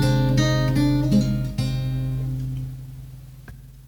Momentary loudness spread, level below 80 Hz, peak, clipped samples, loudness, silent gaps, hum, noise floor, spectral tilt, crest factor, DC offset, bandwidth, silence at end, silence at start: 22 LU; -34 dBFS; -8 dBFS; under 0.1%; -22 LUFS; none; none; -42 dBFS; -7 dB/octave; 14 dB; under 0.1%; 18 kHz; 0 s; 0 s